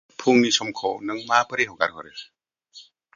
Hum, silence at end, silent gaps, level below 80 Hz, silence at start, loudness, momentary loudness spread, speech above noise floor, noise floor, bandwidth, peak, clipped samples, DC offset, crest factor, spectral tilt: none; 0.35 s; none; -68 dBFS; 0.2 s; -22 LUFS; 19 LU; 28 dB; -50 dBFS; 7.4 kHz; -2 dBFS; under 0.1%; under 0.1%; 22 dB; -3 dB/octave